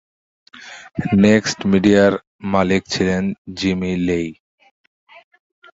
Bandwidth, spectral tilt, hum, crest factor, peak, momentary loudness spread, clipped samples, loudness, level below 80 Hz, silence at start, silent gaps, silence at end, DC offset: 7.8 kHz; -6 dB/octave; none; 18 dB; -2 dBFS; 14 LU; under 0.1%; -17 LUFS; -44 dBFS; 0.55 s; 2.27-2.39 s, 3.38-3.45 s; 1.4 s; under 0.1%